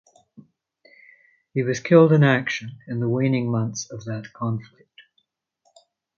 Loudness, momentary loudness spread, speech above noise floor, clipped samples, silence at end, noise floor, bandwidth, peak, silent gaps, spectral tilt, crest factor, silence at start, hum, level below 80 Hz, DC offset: -22 LUFS; 16 LU; 50 dB; under 0.1%; 1.55 s; -71 dBFS; 7.2 kHz; 0 dBFS; none; -6.5 dB/octave; 22 dB; 1.55 s; none; -64 dBFS; under 0.1%